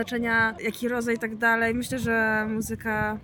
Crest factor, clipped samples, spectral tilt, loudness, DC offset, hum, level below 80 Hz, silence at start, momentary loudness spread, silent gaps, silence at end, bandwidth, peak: 14 dB; under 0.1%; -5 dB/octave; -25 LUFS; under 0.1%; none; -52 dBFS; 0 s; 6 LU; none; 0 s; 17.5 kHz; -12 dBFS